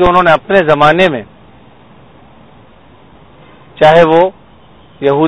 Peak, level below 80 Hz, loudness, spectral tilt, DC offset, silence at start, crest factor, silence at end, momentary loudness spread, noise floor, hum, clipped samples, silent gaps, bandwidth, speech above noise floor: 0 dBFS; -38 dBFS; -9 LUFS; -6.5 dB/octave; under 0.1%; 0 s; 12 dB; 0 s; 9 LU; -41 dBFS; none; 0.7%; none; 11 kHz; 34 dB